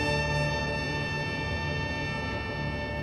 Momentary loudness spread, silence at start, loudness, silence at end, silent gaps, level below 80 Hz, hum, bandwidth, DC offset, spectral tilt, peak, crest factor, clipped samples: 5 LU; 0 s; -30 LUFS; 0 s; none; -42 dBFS; none; 12.5 kHz; under 0.1%; -5.5 dB/octave; -16 dBFS; 14 dB; under 0.1%